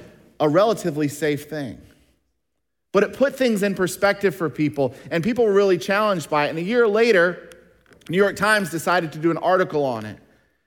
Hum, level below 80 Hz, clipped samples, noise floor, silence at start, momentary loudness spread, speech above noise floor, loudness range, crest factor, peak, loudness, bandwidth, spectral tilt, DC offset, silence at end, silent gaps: none; -60 dBFS; under 0.1%; -79 dBFS; 0 s; 8 LU; 59 dB; 4 LU; 18 dB; -4 dBFS; -20 LUFS; 18.5 kHz; -5.5 dB/octave; under 0.1%; 0.5 s; none